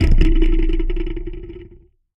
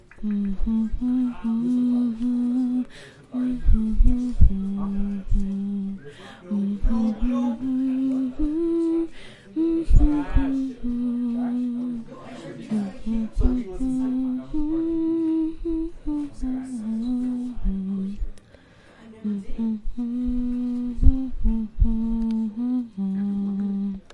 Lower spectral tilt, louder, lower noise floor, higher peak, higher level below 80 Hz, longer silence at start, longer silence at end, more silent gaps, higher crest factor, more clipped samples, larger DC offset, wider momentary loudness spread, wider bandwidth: about the same, -8 dB/octave vs -9 dB/octave; first, -21 LUFS vs -26 LUFS; second, -46 dBFS vs -51 dBFS; about the same, 0 dBFS vs -2 dBFS; first, -16 dBFS vs -28 dBFS; second, 0 s vs 0.15 s; first, 0.5 s vs 0.15 s; neither; second, 14 dB vs 22 dB; neither; neither; first, 19 LU vs 8 LU; second, 5.6 kHz vs 9.2 kHz